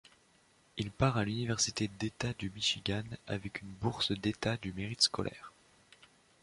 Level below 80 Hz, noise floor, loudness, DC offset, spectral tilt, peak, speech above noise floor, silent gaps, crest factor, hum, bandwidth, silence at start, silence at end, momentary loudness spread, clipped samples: -58 dBFS; -67 dBFS; -34 LUFS; under 0.1%; -4 dB/octave; -12 dBFS; 32 dB; none; 24 dB; none; 11.5 kHz; 0.75 s; 0.95 s; 12 LU; under 0.1%